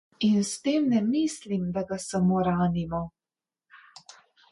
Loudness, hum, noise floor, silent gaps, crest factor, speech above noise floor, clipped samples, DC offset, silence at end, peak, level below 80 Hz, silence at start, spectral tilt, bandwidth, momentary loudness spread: -26 LUFS; none; under -90 dBFS; none; 14 dB; over 65 dB; under 0.1%; under 0.1%; 0.75 s; -14 dBFS; -56 dBFS; 0.2 s; -6 dB/octave; 11.5 kHz; 7 LU